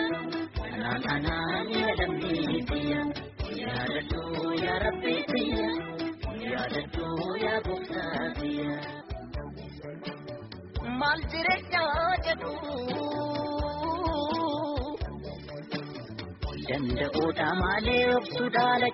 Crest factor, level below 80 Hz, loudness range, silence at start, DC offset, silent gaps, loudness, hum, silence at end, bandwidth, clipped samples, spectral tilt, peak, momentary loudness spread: 18 dB; -44 dBFS; 4 LU; 0 s; under 0.1%; none; -30 LUFS; none; 0 s; 6 kHz; under 0.1%; -3.5 dB/octave; -12 dBFS; 13 LU